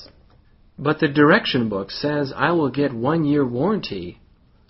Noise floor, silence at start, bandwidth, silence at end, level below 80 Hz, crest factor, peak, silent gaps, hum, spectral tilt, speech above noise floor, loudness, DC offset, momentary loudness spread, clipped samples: -53 dBFS; 0 s; 6 kHz; 0.55 s; -52 dBFS; 20 dB; -2 dBFS; none; none; -4.5 dB/octave; 33 dB; -20 LUFS; under 0.1%; 11 LU; under 0.1%